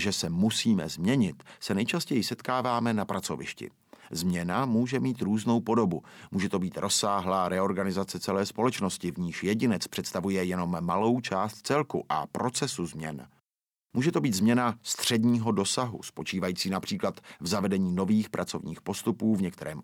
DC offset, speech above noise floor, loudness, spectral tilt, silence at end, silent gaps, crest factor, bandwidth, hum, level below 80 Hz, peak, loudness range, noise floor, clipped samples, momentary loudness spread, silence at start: under 0.1%; over 62 dB; -29 LUFS; -5 dB/octave; 0 s; none; 18 dB; 17 kHz; none; -64 dBFS; -12 dBFS; 2 LU; under -90 dBFS; under 0.1%; 9 LU; 0 s